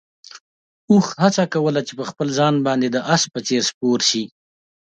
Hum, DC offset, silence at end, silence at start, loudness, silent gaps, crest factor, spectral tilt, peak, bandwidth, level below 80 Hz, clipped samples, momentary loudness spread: none; under 0.1%; 0.7 s; 0.35 s; -19 LUFS; 0.40-0.88 s, 3.74-3.81 s; 20 dB; -4.5 dB/octave; 0 dBFS; 9.2 kHz; -64 dBFS; under 0.1%; 7 LU